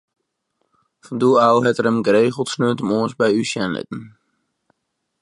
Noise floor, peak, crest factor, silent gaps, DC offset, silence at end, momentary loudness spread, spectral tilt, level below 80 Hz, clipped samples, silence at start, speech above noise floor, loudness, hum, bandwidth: -75 dBFS; -2 dBFS; 18 dB; none; under 0.1%; 1.15 s; 13 LU; -5.5 dB/octave; -62 dBFS; under 0.1%; 1.1 s; 58 dB; -18 LUFS; none; 11.5 kHz